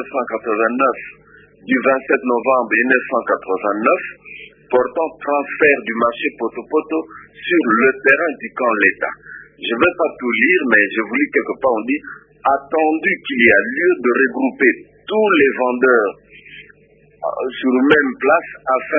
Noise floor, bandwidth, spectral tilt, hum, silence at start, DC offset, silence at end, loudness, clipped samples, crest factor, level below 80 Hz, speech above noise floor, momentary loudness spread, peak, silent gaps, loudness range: -51 dBFS; 3.8 kHz; -7.5 dB/octave; none; 0 s; under 0.1%; 0 s; -16 LUFS; under 0.1%; 18 dB; -58 dBFS; 34 dB; 11 LU; 0 dBFS; none; 3 LU